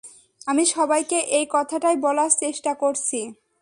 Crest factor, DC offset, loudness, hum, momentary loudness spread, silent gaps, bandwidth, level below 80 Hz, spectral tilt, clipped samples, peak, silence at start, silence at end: 18 dB; under 0.1%; -21 LUFS; none; 7 LU; none; 11.5 kHz; -72 dBFS; -1 dB/octave; under 0.1%; -4 dBFS; 0.05 s; 0.3 s